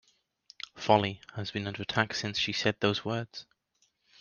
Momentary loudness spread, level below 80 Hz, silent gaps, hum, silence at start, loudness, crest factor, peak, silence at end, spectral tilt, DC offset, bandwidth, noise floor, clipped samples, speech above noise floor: 17 LU; -68 dBFS; none; none; 0.75 s; -30 LUFS; 24 dB; -8 dBFS; 0.8 s; -4.5 dB/octave; under 0.1%; 7.2 kHz; -74 dBFS; under 0.1%; 43 dB